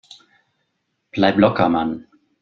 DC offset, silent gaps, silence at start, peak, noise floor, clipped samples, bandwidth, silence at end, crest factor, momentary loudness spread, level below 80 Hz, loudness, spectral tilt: under 0.1%; none; 1.15 s; -2 dBFS; -73 dBFS; under 0.1%; 7.6 kHz; 0.45 s; 20 dB; 15 LU; -54 dBFS; -18 LUFS; -7.5 dB/octave